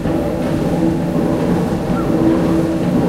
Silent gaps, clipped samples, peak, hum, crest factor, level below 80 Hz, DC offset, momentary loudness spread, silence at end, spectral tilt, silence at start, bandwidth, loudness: none; under 0.1%; -2 dBFS; none; 14 dB; -32 dBFS; under 0.1%; 4 LU; 0 s; -8 dB/octave; 0 s; 15.5 kHz; -16 LUFS